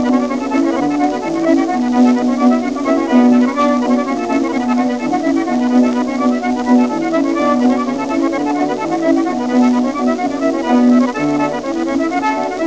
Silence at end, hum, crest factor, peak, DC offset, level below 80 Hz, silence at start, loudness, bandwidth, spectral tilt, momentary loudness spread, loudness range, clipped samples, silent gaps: 0 s; none; 14 dB; 0 dBFS; 0.5%; -50 dBFS; 0 s; -15 LUFS; 8.2 kHz; -5.5 dB/octave; 5 LU; 2 LU; under 0.1%; none